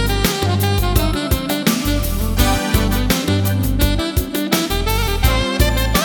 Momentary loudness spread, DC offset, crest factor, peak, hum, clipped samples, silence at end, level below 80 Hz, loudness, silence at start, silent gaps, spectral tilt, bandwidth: 3 LU; under 0.1%; 16 dB; -2 dBFS; none; under 0.1%; 0 s; -22 dBFS; -17 LUFS; 0 s; none; -4.5 dB/octave; 19.5 kHz